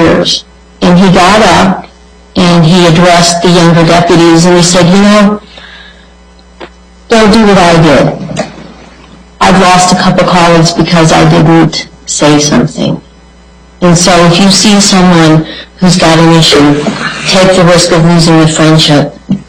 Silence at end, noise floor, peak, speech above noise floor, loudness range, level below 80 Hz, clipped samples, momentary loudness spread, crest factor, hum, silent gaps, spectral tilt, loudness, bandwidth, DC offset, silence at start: 0.05 s; -35 dBFS; 0 dBFS; 31 dB; 3 LU; -28 dBFS; 1%; 8 LU; 6 dB; none; none; -4.5 dB/octave; -4 LUFS; 13.5 kHz; under 0.1%; 0 s